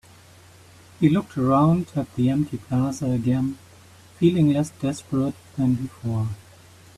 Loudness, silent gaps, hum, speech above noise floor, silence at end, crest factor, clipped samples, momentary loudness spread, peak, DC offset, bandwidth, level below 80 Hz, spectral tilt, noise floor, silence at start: -23 LUFS; none; none; 28 dB; 0.6 s; 18 dB; under 0.1%; 10 LU; -6 dBFS; under 0.1%; 13.5 kHz; -52 dBFS; -8 dB/octave; -49 dBFS; 1 s